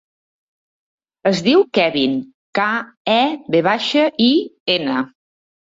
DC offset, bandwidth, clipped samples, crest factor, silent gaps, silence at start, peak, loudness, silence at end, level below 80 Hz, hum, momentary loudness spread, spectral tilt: under 0.1%; 7.8 kHz; under 0.1%; 16 dB; 2.34-2.53 s, 2.97-3.05 s, 4.60-4.66 s; 1.25 s; -4 dBFS; -17 LUFS; 0.55 s; -62 dBFS; none; 8 LU; -5 dB/octave